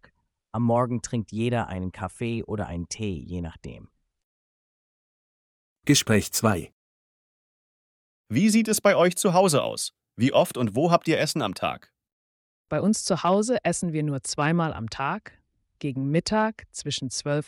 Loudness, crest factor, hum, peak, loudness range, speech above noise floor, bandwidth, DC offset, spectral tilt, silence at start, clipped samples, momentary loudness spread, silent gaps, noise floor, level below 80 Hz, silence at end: -25 LUFS; 22 dB; none; -4 dBFS; 10 LU; 37 dB; 18 kHz; under 0.1%; -5 dB/octave; 0.55 s; under 0.1%; 12 LU; 4.24-5.76 s, 6.72-8.24 s, 12.12-12.65 s; -62 dBFS; -56 dBFS; 0.05 s